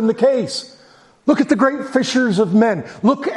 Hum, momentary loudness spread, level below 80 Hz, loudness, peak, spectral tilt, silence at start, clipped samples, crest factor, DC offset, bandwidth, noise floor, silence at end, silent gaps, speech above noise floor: none; 7 LU; -62 dBFS; -17 LUFS; 0 dBFS; -5.5 dB/octave; 0 s; under 0.1%; 16 dB; under 0.1%; 11.5 kHz; -49 dBFS; 0 s; none; 33 dB